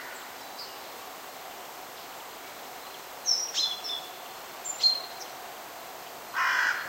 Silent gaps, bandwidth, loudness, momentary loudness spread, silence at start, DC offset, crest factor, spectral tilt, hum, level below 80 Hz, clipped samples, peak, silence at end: none; 16 kHz; -31 LUFS; 17 LU; 0 s; under 0.1%; 22 dB; 1.5 dB/octave; none; -74 dBFS; under 0.1%; -12 dBFS; 0 s